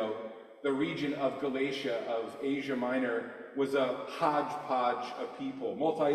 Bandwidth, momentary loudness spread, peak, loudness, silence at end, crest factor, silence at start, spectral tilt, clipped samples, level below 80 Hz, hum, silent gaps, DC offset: 13 kHz; 8 LU; -14 dBFS; -33 LUFS; 0 s; 18 dB; 0 s; -6 dB/octave; under 0.1%; -76 dBFS; none; none; under 0.1%